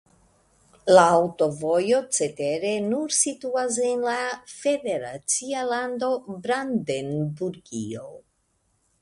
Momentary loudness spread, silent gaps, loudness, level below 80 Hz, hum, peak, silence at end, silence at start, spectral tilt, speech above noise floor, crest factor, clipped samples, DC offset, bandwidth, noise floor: 13 LU; none; -24 LUFS; -64 dBFS; none; -2 dBFS; 0.85 s; 0.85 s; -3.5 dB/octave; 46 dB; 22 dB; under 0.1%; under 0.1%; 11.5 kHz; -70 dBFS